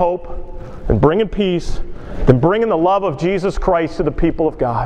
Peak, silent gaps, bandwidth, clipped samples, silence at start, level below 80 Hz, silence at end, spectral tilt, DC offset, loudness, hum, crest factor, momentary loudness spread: 0 dBFS; none; 9.2 kHz; under 0.1%; 0 s; -26 dBFS; 0 s; -8 dB/octave; under 0.1%; -16 LUFS; none; 16 dB; 17 LU